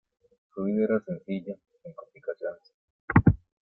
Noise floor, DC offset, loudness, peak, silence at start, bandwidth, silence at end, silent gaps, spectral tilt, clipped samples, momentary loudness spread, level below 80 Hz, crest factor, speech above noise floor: -47 dBFS; under 0.1%; -28 LUFS; -4 dBFS; 0.55 s; 5.2 kHz; 0.25 s; 2.74-3.08 s; -12 dB/octave; under 0.1%; 23 LU; -46 dBFS; 24 dB; 18 dB